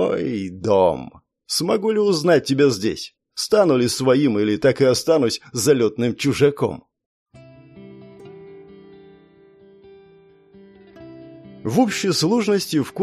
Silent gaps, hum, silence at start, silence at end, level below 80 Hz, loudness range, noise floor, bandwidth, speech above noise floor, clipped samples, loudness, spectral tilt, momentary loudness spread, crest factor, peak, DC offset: 7.06-7.26 s; none; 0 s; 0 s; -58 dBFS; 9 LU; -51 dBFS; 15 kHz; 32 dB; under 0.1%; -19 LUFS; -5 dB/octave; 13 LU; 18 dB; -4 dBFS; under 0.1%